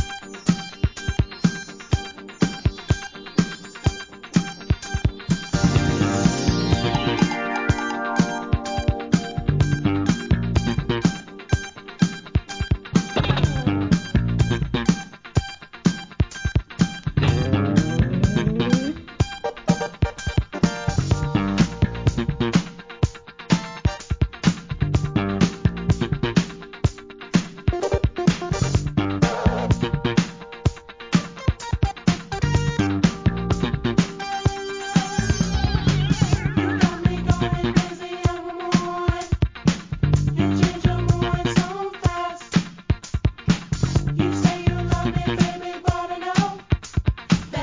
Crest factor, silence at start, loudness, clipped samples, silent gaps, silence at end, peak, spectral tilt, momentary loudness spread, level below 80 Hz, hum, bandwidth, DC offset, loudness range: 20 dB; 0 s; -23 LUFS; under 0.1%; none; 0 s; -2 dBFS; -6 dB/octave; 6 LU; -32 dBFS; none; 7.6 kHz; under 0.1%; 2 LU